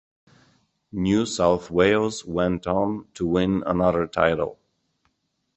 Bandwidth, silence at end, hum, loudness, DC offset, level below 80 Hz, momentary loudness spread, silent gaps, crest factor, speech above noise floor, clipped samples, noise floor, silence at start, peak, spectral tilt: 8.6 kHz; 1.05 s; none; -23 LUFS; under 0.1%; -46 dBFS; 8 LU; none; 20 dB; 51 dB; under 0.1%; -73 dBFS; 0.95 s; -2 dBFS; -6 dB/octave